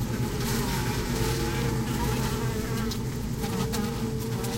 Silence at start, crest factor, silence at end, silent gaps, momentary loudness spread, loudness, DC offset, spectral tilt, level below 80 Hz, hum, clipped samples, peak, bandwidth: 0 s; 14 dB; 0 s; none; 3 LU; -29 LUFS; under 0.1%; -5 dB/octave; -38 dBFS; none; under 0.1%; -14 dBFS; 16 kHz